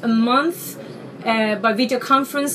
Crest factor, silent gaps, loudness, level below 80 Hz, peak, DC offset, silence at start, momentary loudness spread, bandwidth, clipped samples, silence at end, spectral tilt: 16 dB; none; -19 LUFS; -74 dBFS; -4 dBFS; under 0.1%; 0 s; 15 LU; 15.5 kHz; under 0.1%; 0 s; -4 dB/octave